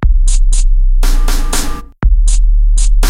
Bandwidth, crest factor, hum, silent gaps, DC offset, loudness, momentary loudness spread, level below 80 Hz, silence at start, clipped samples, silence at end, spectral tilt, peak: 14.5 kHz; 8 dB; none; none; under 0.1%; -15 LUFS; 4 LU; -8 dBFS; 0 s; under 0.1%; 0 s; -4 dB/octave; 0 dBFS